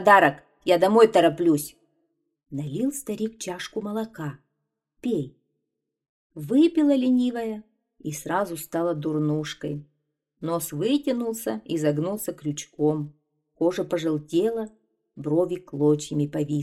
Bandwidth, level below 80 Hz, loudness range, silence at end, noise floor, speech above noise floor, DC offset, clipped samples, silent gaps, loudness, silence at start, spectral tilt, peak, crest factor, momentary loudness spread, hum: 15 kHz; -64 dBFS; 8 LU; 0 s; -81 dBFS; 58 dB; under 0.1%; under 0.1%; 6.09-6.30 s; -25 LUFS; 0 s; -5.5 dB/octave; -2 dBFS; 22 dB; 15 LU; none